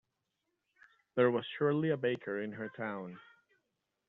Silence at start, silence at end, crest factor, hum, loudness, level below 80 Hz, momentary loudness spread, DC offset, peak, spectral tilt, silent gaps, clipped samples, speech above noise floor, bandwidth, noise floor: 1.15 s; 0.85 s; 22 dB; none; -34 LUFS; -80 dBFS; 13 LU; under 0.1%; -16 dBFS; -5.5 dB/octave; none; under 0.1%; 51 dB; 4.1 kHz; -85 dBFS